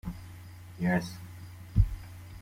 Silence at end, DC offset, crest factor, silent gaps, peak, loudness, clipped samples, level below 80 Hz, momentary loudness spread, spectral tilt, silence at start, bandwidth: 0 s; under 0.1%; 22 dB; none; -10 dBFS; -32 LUFS; under 0.1%; -38 dBFS; 18 LU; -7 dB/octave; 0.05 s; 16 kHz